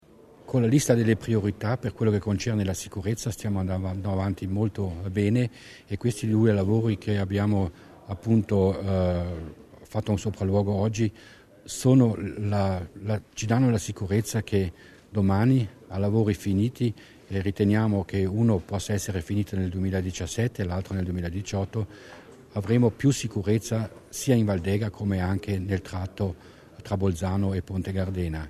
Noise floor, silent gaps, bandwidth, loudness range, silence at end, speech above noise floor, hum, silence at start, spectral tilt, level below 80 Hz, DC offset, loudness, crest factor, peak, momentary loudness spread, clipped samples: -49 dBFS; none; 13.5 kHz; 3 LU; 0 s; 24 dB; none; 0.45 s; -7 dB/octave; -52 dBFS; under 0.1%; -26 LUFS; 18 dB; -8 dBFS; 10 LU; under 0.1%